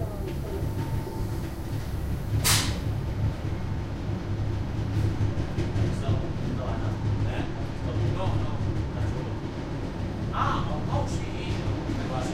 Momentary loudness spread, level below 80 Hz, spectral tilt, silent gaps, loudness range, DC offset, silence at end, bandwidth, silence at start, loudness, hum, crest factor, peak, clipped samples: 6 LU; -36 dBFS; -5.5 dB/octave; none; 2 LU; under 0.1%; 0 s; 16 kHz; 0 s; -29 LUFS; none; 20 dB; -8 dBFS; under 0.1%